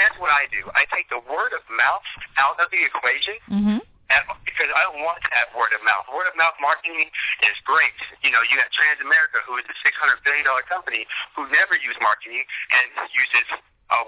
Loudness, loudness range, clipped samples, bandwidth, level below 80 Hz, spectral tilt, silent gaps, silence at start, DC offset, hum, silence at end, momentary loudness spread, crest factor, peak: -20 LUFS; 2 LU; under 0.1%; 4 kHz; -60 dBFS; -6.5 dB/octave; none; 0 s; under 0.1%; none; 0 s; 8 LU; 16 dB; -6 dBFS